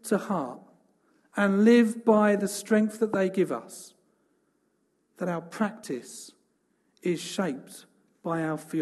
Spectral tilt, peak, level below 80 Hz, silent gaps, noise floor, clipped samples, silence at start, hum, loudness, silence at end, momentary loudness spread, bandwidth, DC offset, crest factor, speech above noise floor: -6 dB/octave; -8 dBFS; -76 dBFS; none; -72 dBFS; under 0.1%; 0.05 s; none; -26 LUFS; 0 s; 19 LU; 12.5 kHz; under 0.1%; 20 dB; 46 dB